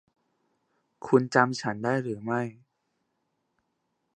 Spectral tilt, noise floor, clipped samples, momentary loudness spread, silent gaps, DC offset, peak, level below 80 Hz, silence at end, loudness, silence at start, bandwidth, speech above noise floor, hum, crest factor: -6 dB/octave; -78 dBFS; under 0.1%; 11 LU; none; under 0.1%; -4 dBFS; -72 dBFS; 1.65 s; -26 LUFS; 1.05 s; 9.6 kHz; 52 dB; none; 26 dB